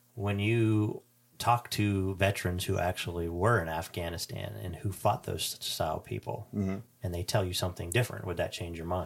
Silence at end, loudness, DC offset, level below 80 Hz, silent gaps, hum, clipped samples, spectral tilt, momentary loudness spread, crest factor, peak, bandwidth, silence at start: 0 s; -32 LUFS; under 0.1%; -54 dBFS; none; none; under 0.1%; -5 dB/octave; 10 LU; 20 dB; -12 dBFS; 17 kHz; 0.15 s